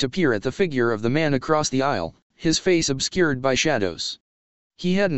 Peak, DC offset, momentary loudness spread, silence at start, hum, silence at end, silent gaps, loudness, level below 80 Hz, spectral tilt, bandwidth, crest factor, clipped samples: -4 dBFS; 1%; 9 LU; 0 s; none; 0 s; 2.22-2.30 s, 4.21-4.70 s; -22 LUFS; -48 dBFS; -4.5 dB/octave; 8.4 kHz; 18 dB; under 0.1%